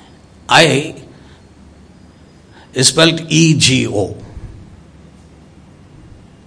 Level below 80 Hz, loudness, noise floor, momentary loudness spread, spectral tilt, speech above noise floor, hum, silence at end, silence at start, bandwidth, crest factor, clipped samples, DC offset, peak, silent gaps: -44 dBFS; -12 LUFS; -43 dBFS; 25 LU; -3.5 dB/octave; 31 dB; none; 1.85 s; 0.5 s; 11 kHz; 16 dB; 0.2%; under 0.1%; 0 dBFS; none